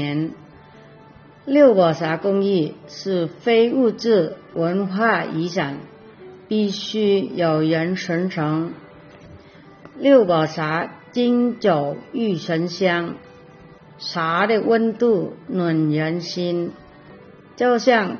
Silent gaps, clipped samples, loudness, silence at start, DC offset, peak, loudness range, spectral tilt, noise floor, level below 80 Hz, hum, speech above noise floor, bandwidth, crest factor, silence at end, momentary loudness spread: none; under 0.1%; -20 LUFS; 0 s; under 0.1%; -2 dBFS; 3 LU; -5 dB/octave; -46 dBFS; -64 dBFS; none; 27 dB; 6.6 kHz; 18 dB; 0 s; 11 LU